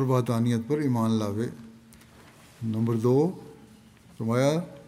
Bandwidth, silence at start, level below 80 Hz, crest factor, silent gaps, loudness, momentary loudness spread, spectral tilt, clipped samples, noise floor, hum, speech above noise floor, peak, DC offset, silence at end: 15 kHz; 0 s; -66 dBFS; 16 dB; none; -26 LUFS; 11 LU; -7.5 dB/octave; under 0.1%; -53 dBFS; none; 28 dB; -10 dBFS; under 0.1%; 0 s